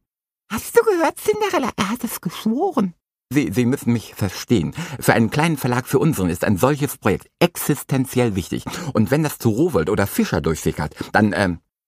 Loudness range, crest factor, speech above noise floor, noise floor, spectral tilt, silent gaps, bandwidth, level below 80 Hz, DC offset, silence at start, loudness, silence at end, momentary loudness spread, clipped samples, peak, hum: 2 LU; 20 dB; 52 dB; -72 dBFS; -5.5 dB/octave; none; 15.5 kHz; -46 dBFS; under 0.1%; 0.5 s; -20 LUFS; 0.3 s; 8 LU; under 0.1%; 0 dBFS; none